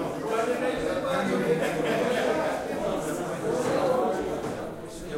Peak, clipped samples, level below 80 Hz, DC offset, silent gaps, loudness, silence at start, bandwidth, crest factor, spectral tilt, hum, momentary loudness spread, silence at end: -12 dBFS; under 0.1%; -52 dBFS; under 0.1%; none; -27 LUFS; 0 s; 16 kHz; 14 dB; -5 dB/octave; none; 6 LU; 0 s